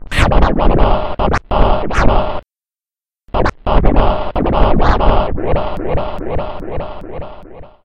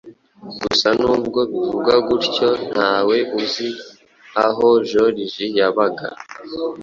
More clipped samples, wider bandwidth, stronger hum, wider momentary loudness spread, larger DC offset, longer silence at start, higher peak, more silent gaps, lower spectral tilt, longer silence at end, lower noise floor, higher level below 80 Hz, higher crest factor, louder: first, 0.6% vs under 0.1%; first, 9.6 kHz vs 7.4 kHz; neither; about the same, 13 LU vs 12 LU; neither; about the same, 0 s vs 0.05 s; about the same, 0 dBFS vs -2 dBFS; neither; first, -7 dB/octave vs -4.5 dB/octave; first, 0.2 s vs 0 s; first, under -90 dBFS vs -38 dBFS; first, -18 dBFS vs -54 dBFS; about the same, 12 dB vs 16 dB; about the same, -16 LUFS vs -18 LUFS